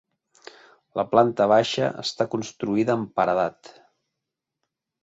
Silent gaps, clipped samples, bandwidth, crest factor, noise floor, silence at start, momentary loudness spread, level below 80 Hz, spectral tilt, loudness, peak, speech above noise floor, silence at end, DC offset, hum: none; under 0.1%; 8.2 kHz; 22 dB; -84 dBFS; 0.95 s; 10 LU; -64 dBFS; -5.5 dB/octave; -23 LUFS; -2 dBFS; 62 dB; 1.55 s; under 0.1%; none